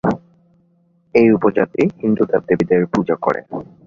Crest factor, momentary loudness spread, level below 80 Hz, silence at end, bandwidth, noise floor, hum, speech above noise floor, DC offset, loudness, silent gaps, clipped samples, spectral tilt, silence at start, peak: 16 dB; 9 LU; -52 dBFS; 0.25 s; 7.4 kHz; -58 dBFS; none; 42 dB; under 0.1%; -17 LUFS; none; under 0.1%; -8.5 dB/octave; 0.05 s; -2 dBFS